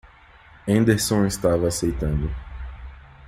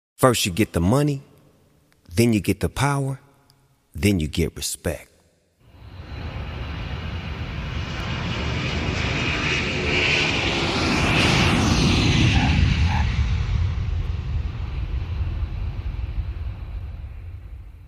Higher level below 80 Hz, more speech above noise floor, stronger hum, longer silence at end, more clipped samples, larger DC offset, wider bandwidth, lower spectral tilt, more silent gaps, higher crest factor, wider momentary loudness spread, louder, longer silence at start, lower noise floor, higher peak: about the same, -34 dBFS vs -30 dBFS; second, 29 dB vs 39 dB; neither; about the same, 0 s vs 0 s; neither; neither; about the same, 15.5 kHz vs 15.5 kHz; about the same, -5.5 dB/octave vs -5 dB/octave; neither; about the same, 18 dB vs 22 dB; first, 19 LU vs 16 LU; about the same, -22 LUFS vs -22 LUFS; first, 0.65 s vs 0.2 s; second, -49 dBFS vs -60 dBFS; second, -4 dBFS vs 0 dBFS